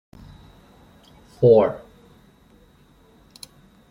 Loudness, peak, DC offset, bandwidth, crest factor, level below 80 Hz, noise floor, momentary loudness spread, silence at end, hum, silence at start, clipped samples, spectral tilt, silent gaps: -17 LUFS; -4 dBFS; under 0.1%; 11.5 kHz; 20 dB; -56 dBFS; -54 dBFS; 28 LU; 2.15 s; none; 1.4 s; under 0.1%; -8 dB/octave; none